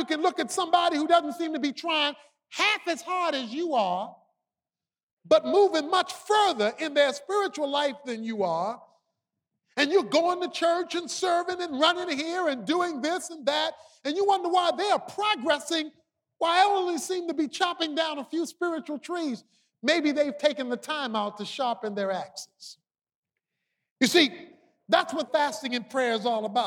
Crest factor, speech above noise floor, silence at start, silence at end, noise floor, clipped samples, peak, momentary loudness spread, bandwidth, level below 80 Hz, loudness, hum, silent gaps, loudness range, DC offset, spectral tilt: 20 dB; over 64 dB; 0 s; 0 s; under -90 dBFS; under 0.1%; -6 dBFS; 10 LU; 17.5 kHz; -82 dBFS; -26 LUFS; none; 5.03-5.17 s, 23.15-23.23 s, 23.91-23.96 s; 4 LU; under 0.1%; -2.5 dB/octave